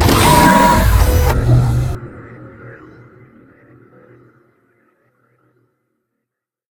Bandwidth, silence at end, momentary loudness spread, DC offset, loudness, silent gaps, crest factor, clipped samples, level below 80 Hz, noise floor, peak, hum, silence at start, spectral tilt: 19.5 kHz; 3.95 s; 27 LU; under 0.1%; -12 LUFS; none; 16 dB; under 0.1%; -22 dBFS; -80 dBFS; 0 dBFS; none; 0 s; -5 dB/octave